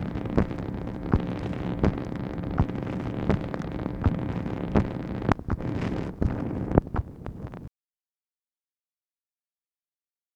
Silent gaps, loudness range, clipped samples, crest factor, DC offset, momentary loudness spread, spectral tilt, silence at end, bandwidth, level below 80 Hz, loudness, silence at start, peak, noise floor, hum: none; 5 LU; under 0.1%; 28 dB; under 0.1%; 8 LU; -9 dB/octave; 2.65 s; 8.4 kHz; -38 dBFS; -29 LUFS; 0 s; 0 dBFS; under -90 dBFS; none